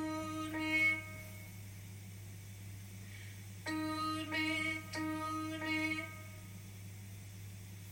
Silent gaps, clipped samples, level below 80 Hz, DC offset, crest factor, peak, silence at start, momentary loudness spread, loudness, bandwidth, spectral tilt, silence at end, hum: none; under 0.1%; -66 dBFS; under 0.1%; 18 dB; -22 dBFS; 0 s; 17 LU; -37 LUFS; 16.5 kHz; -4.5 dB/octave; 0 s; none